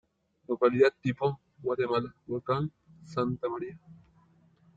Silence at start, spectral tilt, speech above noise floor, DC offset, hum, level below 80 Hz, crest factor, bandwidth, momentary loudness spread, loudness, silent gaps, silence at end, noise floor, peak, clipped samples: 0.5 s; -8 dB/octave; 34 dB; under 0.1%; none; -66 dBFS; 20 dB; 7.8 kHz; 13 LU; -30 LUFS; none; 0.8 s; -63 dBFS; -12 dBFS; under 0.1%